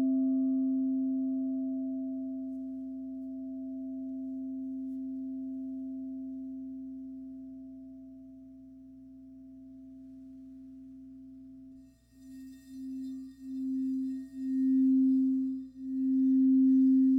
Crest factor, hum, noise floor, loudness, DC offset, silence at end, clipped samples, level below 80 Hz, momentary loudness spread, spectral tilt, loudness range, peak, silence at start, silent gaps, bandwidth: 12 dB; 60 Hz at -65 dBFS; -56 dBFS; -32 LUFS; under 0.1%; 0 s; under 0.1%; -68 dBFS; 25 LU; -9 dB/octave; 21 LU; -20 dBFS; 0 s; none; 2 kHz